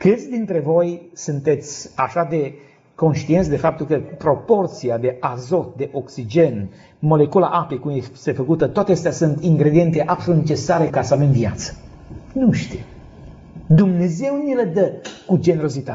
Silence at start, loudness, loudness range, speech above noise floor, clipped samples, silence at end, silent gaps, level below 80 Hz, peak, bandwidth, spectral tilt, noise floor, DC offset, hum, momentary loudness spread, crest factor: 0 s; -19 LUFS; 3 LU; 22 dB; under 0.1%; 0 s; none; -46 dBFS; -2 dBFS; 7.8 kHz; -8 dB/octave; -40 dBFS; under 0.1%; none; 11 LU; 16 dB